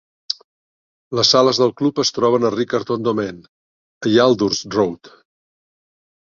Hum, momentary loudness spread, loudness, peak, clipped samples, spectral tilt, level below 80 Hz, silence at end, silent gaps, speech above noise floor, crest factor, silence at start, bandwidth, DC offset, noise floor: none; 14 LU; -18 LUFS; 0 dBFS; under 0.1%; -4.5 dB/octave; -58 dBFS; 1.25 s; 0.44-1.11 s, 3.48-4.01 s; over 73 dB; 18 dB; 0.3 s; 7.6 kHz; under 0.1%; under -90 dBFS